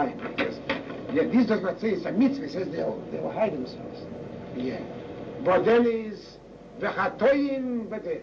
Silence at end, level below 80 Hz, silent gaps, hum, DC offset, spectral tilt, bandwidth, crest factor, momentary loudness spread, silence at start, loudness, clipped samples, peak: 0 s; -58 dBFS; none; none; under 0.1%; -7.5 dB/octave; 7.2 kHz; 16 dB; 16 LU; 0 s; -27 LUFS; under 0.1%; -12 dBFS